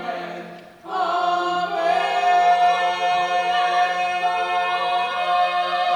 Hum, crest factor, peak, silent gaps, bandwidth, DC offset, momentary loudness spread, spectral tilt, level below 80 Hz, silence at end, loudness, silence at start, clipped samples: none; 12 dB; -8 dBFS; none; 10 kHz; under 0.1%; 12 LU; -2.5 dB/octave; -72 dBFS; 0 s; -20 LUFS; 0 s; under 0.1%